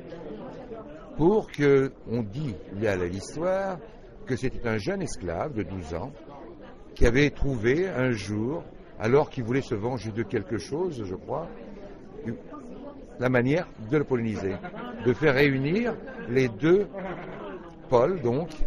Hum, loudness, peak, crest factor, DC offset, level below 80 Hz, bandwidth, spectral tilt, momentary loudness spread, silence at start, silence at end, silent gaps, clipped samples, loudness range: none; -27 LUFS; -4 dBFS; 22 dB; under 0.1%; -40 dBFS; 11.5 kHz; -7 dB/octave; 19 LU; 0 s; 0 s; none; under 0.1%; 6 LU